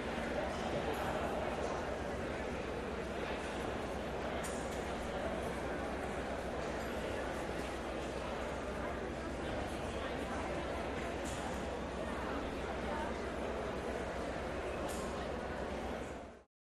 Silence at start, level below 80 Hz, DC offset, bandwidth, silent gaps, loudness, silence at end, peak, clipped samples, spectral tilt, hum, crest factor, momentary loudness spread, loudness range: 0 s; -50 dBFS; under 0.1%; 13 kHz; none; -40 LUFS; 0.25 s; -26 dBFS; under 0.1%; -5 dB/octave; none; 14 dB; 3 LU; 1 LU